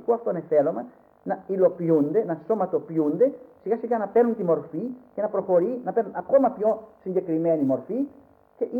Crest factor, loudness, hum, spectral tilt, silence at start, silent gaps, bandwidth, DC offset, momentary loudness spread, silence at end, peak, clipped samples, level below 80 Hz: 16 dB; -25 LUFS; none; -11 dB/octave; 0 s; none; 2.8 kHz; under 0.1%; 11 LU; 0 s; -8 dBFS; under 0.1%; -70 dBFS